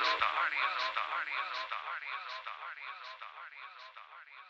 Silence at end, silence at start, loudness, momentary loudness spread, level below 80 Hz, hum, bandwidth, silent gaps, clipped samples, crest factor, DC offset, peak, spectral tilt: 0 s; 0 s; -35 LUFS; 18 LU; -76 dBFS; none; 8.2 kHz; none; under 0.1%; 24 dB; under 0.1%; -14 dBFS; 0 dB/octave